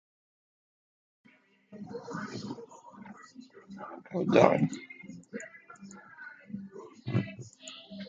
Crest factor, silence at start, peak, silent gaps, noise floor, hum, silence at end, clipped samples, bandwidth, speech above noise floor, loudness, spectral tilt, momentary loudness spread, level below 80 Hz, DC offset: 30 dB; 1.7 s; -4 dBFS; none; -51 dBFS; none; 0 s; under 0.1%; 9.2 kHz; 20 dB; -31 LUFS; -6.5 dB/octave; 25 LU; -70 dBFS; under 0.1%